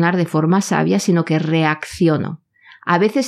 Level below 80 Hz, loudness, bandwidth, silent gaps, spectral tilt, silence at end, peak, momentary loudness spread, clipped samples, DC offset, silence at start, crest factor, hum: -56 dBFS; -17 LUFS; 14 kHz; none; -6 dB/octave; 0 s; -4 dBFS; 8 LU; under 0.1%; under 0.1%; 0 s; 14 dB; none